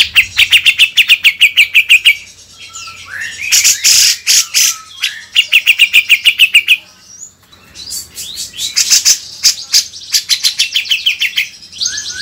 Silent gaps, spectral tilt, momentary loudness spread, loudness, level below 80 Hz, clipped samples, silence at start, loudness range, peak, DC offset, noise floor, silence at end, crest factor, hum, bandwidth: none; 4 dB/octave; 17 LU; -8 LUFS; -50 dBFS; 2%; 0 s; 4 LU; 0 dBFS; under 0.1%; -41 dBFS; 0 s; 12 dB; none; over 20 kHz